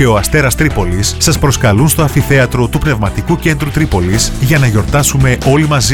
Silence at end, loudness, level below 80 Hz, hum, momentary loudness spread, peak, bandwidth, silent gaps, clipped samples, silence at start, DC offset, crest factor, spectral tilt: 0 s; -11 LUFS; -22 dBFS; none; 4 LU; 0 dBFS; 19 kHz; none; under 0.1%; 0 s; under 0.1%; 10 dB; -5 dB/octave